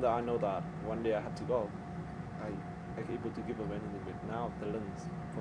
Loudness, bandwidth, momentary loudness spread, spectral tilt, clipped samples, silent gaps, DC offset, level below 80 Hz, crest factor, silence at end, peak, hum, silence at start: -38 LUFS; 10.5 kHz; 9 LU; -8 dB/octave; under 0.1%; none; under 0.1%; -56 dBFS; 18 dB; 0 s; -18 dBFS; none; 0 s